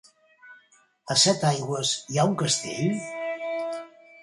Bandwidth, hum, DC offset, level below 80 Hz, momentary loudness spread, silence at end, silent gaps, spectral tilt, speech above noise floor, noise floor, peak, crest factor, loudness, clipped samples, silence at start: 11.5 kHz; none; under 0.1%; -68 dBFS; 12 LU; 0 s; none; -3.5 dB/octave; 36 dB; -60 dBFS; -8 dBFS; 20 dB; -25 LUFS; under 0.1%; 0.45 s